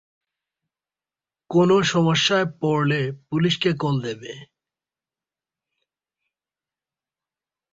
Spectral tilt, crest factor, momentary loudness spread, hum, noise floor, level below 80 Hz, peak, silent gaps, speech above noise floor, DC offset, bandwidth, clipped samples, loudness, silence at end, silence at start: -5.5 dB/octave; 18 dB; 13 LU; none; under -90 dBFS; -62 dBFS; -6 dBFS; none; over 69 dB; under 0.1%; 7.8 kHz; under 0.1%; -21 LUFS; 3.3 s; 1.5 s